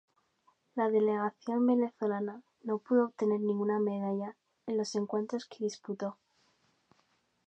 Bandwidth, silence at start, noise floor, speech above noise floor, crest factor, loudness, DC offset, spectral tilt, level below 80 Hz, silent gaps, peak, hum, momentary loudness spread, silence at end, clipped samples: 8.8 kHz; 0.75 s; -74 dBFS; 42 dB; 16 dB; -33 LUFS; under 0.1%; -6.5 dB/octave; -88 dBFS; none; -16 dBFS; none; 11 LU; 1.35 s; under 0.1%